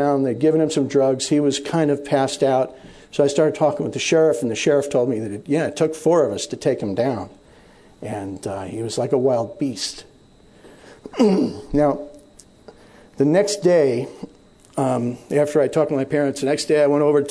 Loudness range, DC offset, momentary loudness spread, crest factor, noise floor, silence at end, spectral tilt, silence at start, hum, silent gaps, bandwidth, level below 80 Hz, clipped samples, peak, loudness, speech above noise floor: 5 LU; under 0.1%; 12 LU; 16 dB; -50 dBFS; 0 s; -5.5 dB/octave; 0 s; none; none; 11 kHz; -52 dBFS; under 0.1%; -4 dBFS; -20 LUFS; 31 dB